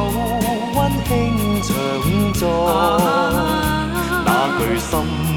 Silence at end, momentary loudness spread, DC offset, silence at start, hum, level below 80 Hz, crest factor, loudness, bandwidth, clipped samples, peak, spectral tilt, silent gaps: 0 s; 4 LU; under 0.1%; 0 s; none; -30 dBFS; 14 dB; -18 LUFS; over 20 kHz; under 0.1%; -2 dBFS; -5.5 dB/octave; none